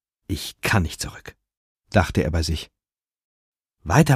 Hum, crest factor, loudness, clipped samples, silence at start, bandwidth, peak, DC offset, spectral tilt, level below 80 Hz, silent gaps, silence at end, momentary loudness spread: none; 24 dB; -24 LUFS; under 0.1%; 0.3 s; 15.5 kHz; 0 dBFS; under 0.1%; -5.5 dB/octave; -36 dBFS; 1.57-1.76 s, 3.24-3.52 s; 0 s; 15 LU